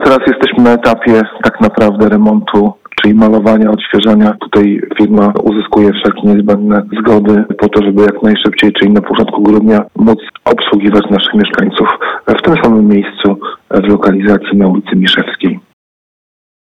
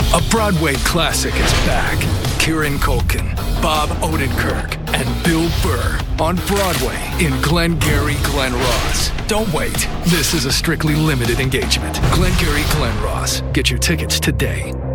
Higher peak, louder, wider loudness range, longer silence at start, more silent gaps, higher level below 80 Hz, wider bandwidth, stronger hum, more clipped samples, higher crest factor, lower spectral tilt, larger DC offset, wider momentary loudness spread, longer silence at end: about the same, 0 dBFS vs 0 dBFS; first, -9 LUFS vs -17 LUFS; about the same, 1 LU vs 2 LU; about the same, 0 s vs 0 s; neither; second, -40 dBFS vs -22 dBFS; second, 6.8 kHz vs 19 kHz; neither; neither; second, 8 dB vs 16 dB; first, -7.5 dB/octave vs -4 dB/octave; neither; about the same, 5 LU vs 4 LU; first, 1.1 s vs 0 s